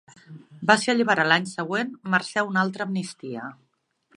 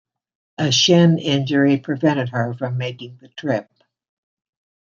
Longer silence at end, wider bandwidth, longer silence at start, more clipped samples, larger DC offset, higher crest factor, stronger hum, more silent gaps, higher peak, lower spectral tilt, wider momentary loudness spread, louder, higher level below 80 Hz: second, 0.65 s vs 1.3 s; first, 11.5 kHz vs 7.4 kHz; second, 0.3 s vs 0.6 s; neither; neither; first, 24 dB vs 18 dB; neither; neither; about the same, -2 dBFS vs -2 dBFS; about the same, -4.5 dB/octave vs -5 dB/octave; about the same, 15 LU vs 15 LU; second, -23 LUFS vs -18 LUFS; second, -72 dBFS vs -64 dBFS